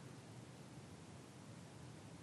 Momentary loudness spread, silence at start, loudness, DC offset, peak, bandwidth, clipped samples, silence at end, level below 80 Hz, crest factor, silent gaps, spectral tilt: 1 LU; 0 s; -57 LUFS; under 0.1%; -44 dBFS; 12.5 kHz; under 0.1%; 0 s; -80 dBFS; 12 dB; none; -5 dB/octave